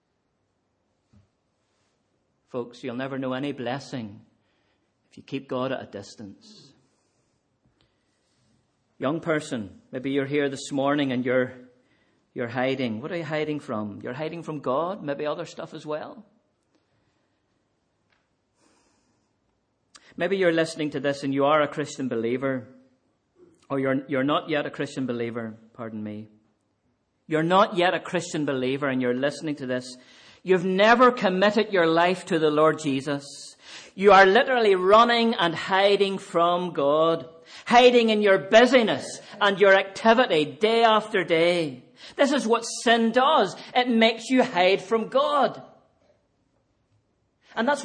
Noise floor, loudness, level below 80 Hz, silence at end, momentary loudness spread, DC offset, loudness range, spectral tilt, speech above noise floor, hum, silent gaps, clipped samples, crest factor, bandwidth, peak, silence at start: -73 dBFS; -23 LUFS; -66 dBFS; 0 s; 18 LU; under 0.1%; 16 LU; -5 dB/octave; 50 dB; none; none; under 0.1%; 20 dB; 10 kHz; -4 dBFS; 2.55 s